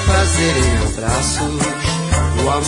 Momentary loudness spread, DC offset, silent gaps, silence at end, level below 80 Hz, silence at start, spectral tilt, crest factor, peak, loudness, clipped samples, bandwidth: 4 LU; under 0.1%; none; 0 s; -24 dBFS; 0 s; -4 dB/octave; 12 dB; -4 dBFS; -16 LUFS; under 0.1%; 11 kHz